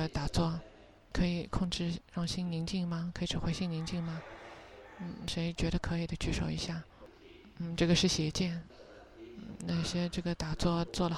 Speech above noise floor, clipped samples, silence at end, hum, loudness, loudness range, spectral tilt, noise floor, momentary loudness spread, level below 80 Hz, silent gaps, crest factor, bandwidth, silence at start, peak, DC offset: 22 dB; under 0.1%; 0 s; none; -35 LUFS; 4 LU; -5 dB/octave; -56 dBFS; 18 LU; -46 dBFS; none; 20 dB; 12 kHz; 0 s; -14 dBFS; under 0.1%